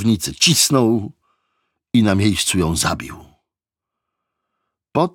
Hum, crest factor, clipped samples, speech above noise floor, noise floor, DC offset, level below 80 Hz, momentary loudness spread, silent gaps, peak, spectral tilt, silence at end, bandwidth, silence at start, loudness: none; 18 dB; under 0.1%; 69 dB; -86 dBFS; under 0.1%; -44 dBFS; 13 LU; none; -2 dBFS; -4 dB/octave; 0.05 s; 18 kHz; 0 s; -17 LUFS